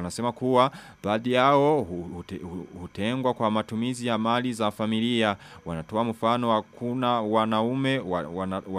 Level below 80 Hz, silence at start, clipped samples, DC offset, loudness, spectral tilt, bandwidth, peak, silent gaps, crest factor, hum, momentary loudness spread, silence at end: -60 dBFS; 0 s; under 0.1%; under 0.1%; -26 LUFS; -6 dB/octave; 14.5 kHz; -6 dBFS; none; 20 dB; none; 14 LU; 0 s